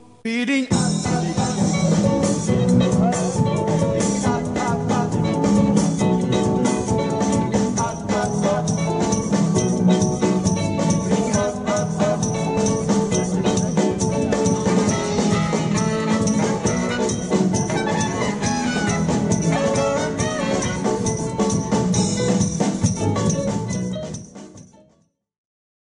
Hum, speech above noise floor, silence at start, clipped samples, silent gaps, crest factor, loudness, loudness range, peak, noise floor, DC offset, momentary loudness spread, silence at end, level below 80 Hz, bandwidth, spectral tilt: none; 41 dB; 0.25 s; under 0.1%; none; 16 dB; -20 LUFS; 2 LU; -4 dBFS; -61 dBFS; under 0.1%; 4 LU; 1.3 s; -42 dBFS; 11 kHz; -5.5 dB/octave